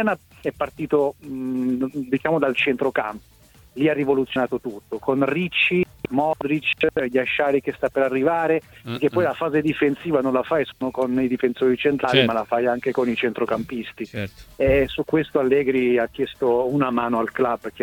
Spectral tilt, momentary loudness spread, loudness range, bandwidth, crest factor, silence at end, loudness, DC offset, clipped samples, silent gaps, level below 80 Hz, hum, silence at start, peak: -6.5 dB/octave; 9 LU; 2 LU; 18 kHz; 20 dB; 0 s; -22 LUFS; under 0.1%; under 0.1%; none; -48 dBFS; none; 0 s; -2 dBFS